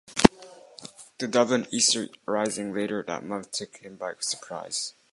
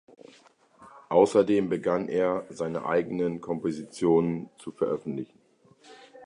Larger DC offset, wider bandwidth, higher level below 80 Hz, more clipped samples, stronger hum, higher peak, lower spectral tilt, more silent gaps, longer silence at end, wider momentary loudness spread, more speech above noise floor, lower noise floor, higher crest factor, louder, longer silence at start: neither; about the same, 11.5 kHz vs 11 kHz; first, -50 dBFS vs -64 dBFS; neither; neither; first, 0 dBFS vs -8 dBFS; second, -3 dB/octave vs -7 dB/octave; neither; first, 0.25 s vs 0 s; first, 21 LU vs 13 LU; second, 21 dB vs 33 dB; second, -49 dBFS vs -59 dBFS; first, 28 dB vs 20 dB; about the same, -26 LUFS vs -27 LUFS; second, 0.1 s vs 0.8 s